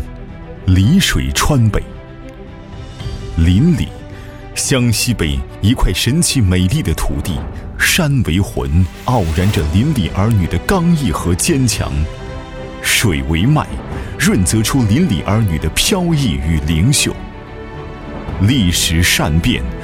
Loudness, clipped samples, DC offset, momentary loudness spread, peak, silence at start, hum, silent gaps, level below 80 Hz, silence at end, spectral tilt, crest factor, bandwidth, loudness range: -14 LUFS; under 0.1%; under 0.1%; 17 LU; 0 dBFS; 0 s; none; none; -24 dBFS; 0 s; -4.5 dB/octave; 14 dB; 17 kHz; 2 LU